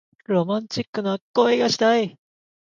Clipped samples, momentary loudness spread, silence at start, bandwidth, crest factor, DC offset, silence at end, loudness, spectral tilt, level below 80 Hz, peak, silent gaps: under 0.1%; 8 LU; 0.3 s; 7.6 kHz; 18 dB; under 0.1%; 0.6 s; -22 LUFS; -5 dB/octave; -66 dBFS; -6 dBFS; 0.87-0.93 s, 1.21-1.34 s